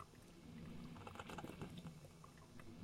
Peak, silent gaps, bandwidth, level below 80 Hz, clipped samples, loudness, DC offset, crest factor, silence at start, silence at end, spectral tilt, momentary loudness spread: -36 dBFS; none; 16 kHz; -70 dBFS; under 0.1%; -56 LUFS; under 0.1%; 20 dB; 0 s; 0 s; -5.5 dB/octave; 9 LU